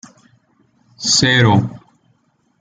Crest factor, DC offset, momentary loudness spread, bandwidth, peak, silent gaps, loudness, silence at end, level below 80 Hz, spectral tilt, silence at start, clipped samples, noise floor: 18 dB; under 0.1%; 12 LU; 9.6 kHz; -2 dBFS; none; -13 LUFS; 0.85 s; -50 dBFS; -3.5 dB/octave; 1 s; under 0.1%; -61 dBFS